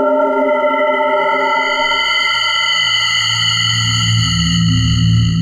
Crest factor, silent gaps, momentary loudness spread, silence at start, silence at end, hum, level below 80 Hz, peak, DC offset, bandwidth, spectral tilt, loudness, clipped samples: 10 dB; none; 2 LU; 0 s; 0 s; none; -32 dBFS; -4 dBFS; under 0.1%; 12.5 kHz; -4 dB/octave; -13 LUFS; under 0.1%